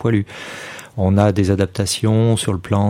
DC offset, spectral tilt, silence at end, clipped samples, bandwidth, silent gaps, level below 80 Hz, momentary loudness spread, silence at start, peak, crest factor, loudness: under 0.1%; -6 dB/octave; 0 s; under 0.1%; 15.5 kHz; none; -46 dBFS; 15 LU; 0 s; 0 dBFS; 16 dB; -17 LUFS